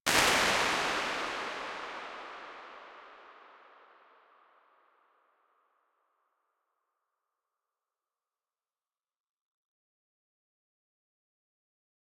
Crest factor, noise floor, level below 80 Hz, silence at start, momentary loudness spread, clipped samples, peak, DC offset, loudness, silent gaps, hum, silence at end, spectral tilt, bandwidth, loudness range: 32 dB; under -90 dBFS; -64 dBFS; 0.05 s; 25 LU; under 0.1%; -6 dBFS; under 0.1%; -30 LUFS; none; none; 8.6 s; -1 dB/octave; 16.5 kHz; 25 LU